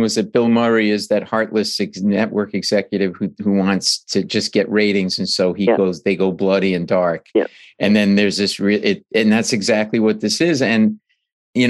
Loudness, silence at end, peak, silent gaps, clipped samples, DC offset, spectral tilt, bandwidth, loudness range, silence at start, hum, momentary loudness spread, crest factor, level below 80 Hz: -17 LUFS; 0 s; -2 dBFS; 11.33-11.53 s; under 0.1%; under 0.1%; -4.5 dB/octave; 12.5 kHz; 2 LU; 0 s; none; 5 LU; 16 dB; -64 dBFS